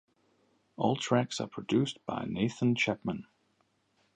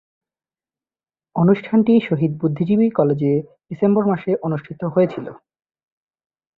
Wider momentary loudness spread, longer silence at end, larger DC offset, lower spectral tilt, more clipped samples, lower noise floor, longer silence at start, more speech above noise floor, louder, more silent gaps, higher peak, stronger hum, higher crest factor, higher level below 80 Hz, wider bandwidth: about the same, 9 LU vs 10 LU; second, 0.95 s vs 1.2 s; neither; second, -5.5 dB/octave vs -11 dB/octave; neither; second, -73 dBFS vs under -90 dBFS; second, 0.8 s vs 1.35 s; second, 42 dB vs over 72 dB; second, -31 LUFS vs -18 LUFS; neither; second, -12 dBFS vs -2 dBFS; neither; about the same, 22 dB vs 18 dB; second, -66 dBFS vs -60 dBFS; first, 9.8 kHz vs 4.6 kHz